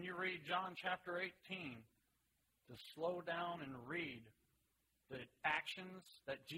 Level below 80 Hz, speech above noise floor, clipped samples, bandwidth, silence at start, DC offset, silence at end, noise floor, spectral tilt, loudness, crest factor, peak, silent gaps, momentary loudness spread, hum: -82 dBFS; 37 dB; under 0.1%; 16 kHz; 0 s; under 0.1%; 0 s; -83 dBFS; -5 dB/octave; -46 LUFS; 22 dB; -24 dBFS; none; 15 LU; none